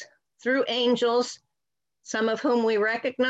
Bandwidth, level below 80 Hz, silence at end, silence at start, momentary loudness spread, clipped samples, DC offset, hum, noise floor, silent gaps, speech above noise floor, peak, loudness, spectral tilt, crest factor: 8.2 kHz; -74 dBFS; 0 s; 0 s; 10 LU; under 0.1%; under 0.1%; none; -88 dBFS; none; 64 dB; -12 dBFS; -25 LUFS; -3.5 dB/octave; 14 dB